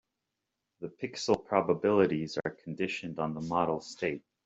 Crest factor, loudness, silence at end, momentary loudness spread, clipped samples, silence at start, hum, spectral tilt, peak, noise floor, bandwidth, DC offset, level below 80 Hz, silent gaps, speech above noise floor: 22 dB; -31 LUFS; 0.25 s; 12 LU; under 0.1%; 0.8 s; none; -5.5 dB/octave; -10 dBFS; -86 dBFS; 8 kHz; under 0.1%; -68 dBFS; none; 55 dB